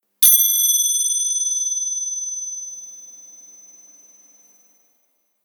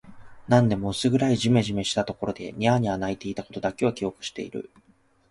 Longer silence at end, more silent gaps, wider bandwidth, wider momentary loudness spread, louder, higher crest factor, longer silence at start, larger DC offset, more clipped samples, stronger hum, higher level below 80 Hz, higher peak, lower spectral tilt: first, 2.15 s vs 0.65 s; neither; first, over 20 kHz vs 11.5 kHz; first, 23 LU vs 13 LU; first, -16 LUFS vs -25 LUFS; about the same, 22 dB vs 20 dB; first, 0.2 s vs 0.05 s; neither; neither; neither; second, -76 dBFS vs -52 dBFS; first, 0 dBFS vs -6 dBFS; second, 6 dB/octave vs -6 dB/octave